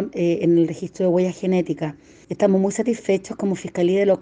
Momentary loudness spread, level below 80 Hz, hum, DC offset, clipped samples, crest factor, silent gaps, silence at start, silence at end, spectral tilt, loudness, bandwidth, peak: 8 LU; -60 dBFS; none; under 0.1%; under 0.1%; 16 dB; none; 0 s; 0 s; -7 dB/octave; -21 LUFS; 9.6 kHz; -4 dBFS